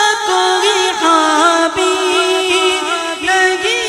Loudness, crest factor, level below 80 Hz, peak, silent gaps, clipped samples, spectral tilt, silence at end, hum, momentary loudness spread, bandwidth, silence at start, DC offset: -12 LUFS; 14 dB; -52 dBFS; 0 dBFS; none; under 0.1%; -0.5 dB/octave; 0 s; none; 4 LU; 15.5 kHz; 0 s; under 0.1%